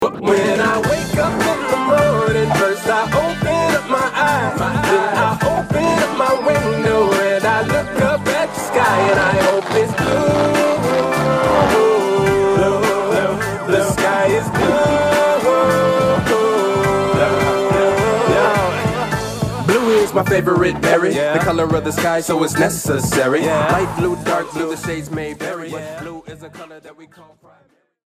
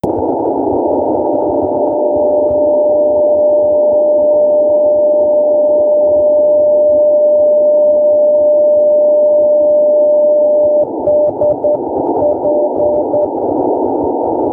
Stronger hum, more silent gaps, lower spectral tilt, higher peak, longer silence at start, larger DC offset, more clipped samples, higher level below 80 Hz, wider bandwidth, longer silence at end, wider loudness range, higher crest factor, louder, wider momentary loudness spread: neither; neither; second, -5 dB/octave vs -11.5 dB/octave; first, 0 dBFS vs -4 dBFS; about the same, 0 s vs 0.05 s; neither; neither; first, -40 dBFS vs -46 dBFS; first, 15.5 kHz vs 1.4 kHz; first, 1.05 s vs 0 s; about the same, 3 LU vs 4 LU; first, 16 dB vs 6 dB; second, -16 LUFS vs -11 LUFS; about the same, 6 LU vs 5 LU